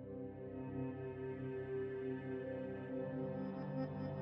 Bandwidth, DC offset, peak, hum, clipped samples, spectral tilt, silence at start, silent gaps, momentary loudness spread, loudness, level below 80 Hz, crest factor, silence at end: 5.4 kHz; under 0.1%; -30 dBFS; none; under 0.1%; -8.5 dB/octave; 0 s; none; 4 LU; -45 LUFS; -68 dBFS; 14 dB; 0 s